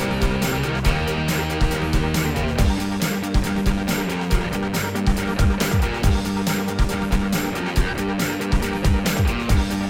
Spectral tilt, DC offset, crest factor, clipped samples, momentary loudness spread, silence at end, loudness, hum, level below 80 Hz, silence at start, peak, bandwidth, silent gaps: -5.5 dB/octave; 0.3%; 14 dB; under 0.1%; 3 LU; 0 s; -22 LUFS; none; -24 dBFS; 0 s; -6 dBFS; over 20 kHz; none